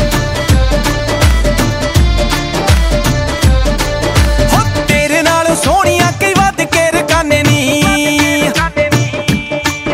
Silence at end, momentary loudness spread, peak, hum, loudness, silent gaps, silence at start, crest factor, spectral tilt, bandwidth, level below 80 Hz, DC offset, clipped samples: 0 s; 4 LU; 0 dBFS; none; -11 LUFS; none; 0 s; 10 dB; -4.5 dB/octave; 16.5 kHz; -18 dBFS; under 0.1%; under 0.1%